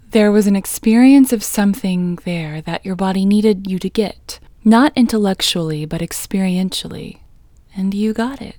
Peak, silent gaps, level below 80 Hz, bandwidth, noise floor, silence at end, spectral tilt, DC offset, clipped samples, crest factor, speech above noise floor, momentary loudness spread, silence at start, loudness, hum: 0 dBFS; none; -44 dBFS; over 20 kHz; -45 dBFS; 0.05 s; -5.5 dB/octave; under 0.1%; under 0.1%; 16 dB; 30 dB; 12 LU; 0.1 s; -16 LUFS; none